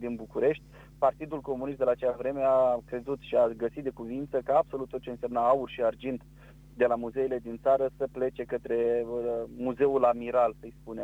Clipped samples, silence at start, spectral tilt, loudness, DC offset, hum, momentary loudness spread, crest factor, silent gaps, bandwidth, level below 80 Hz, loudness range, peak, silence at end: under 0.1%; 0 s; -8 dB/octave; -29 LUFS; under 0.1%; none; 10 LU; 18 dB; none; 8.6 kHz; -56 dBFS; 2 LU; -12 dBFS; 0 s